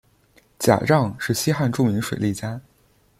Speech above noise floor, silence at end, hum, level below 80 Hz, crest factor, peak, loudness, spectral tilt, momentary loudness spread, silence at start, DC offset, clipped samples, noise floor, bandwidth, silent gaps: 39 dB; 0.6 s; none; -54 dBFS; 20 dB; -2 dBFS; -22 LUFS; -5.5 dB/octave; 11 LU; 0.6 s; under 0.1%; under 0.1%; -60 dBFS; 16.5 kHz; none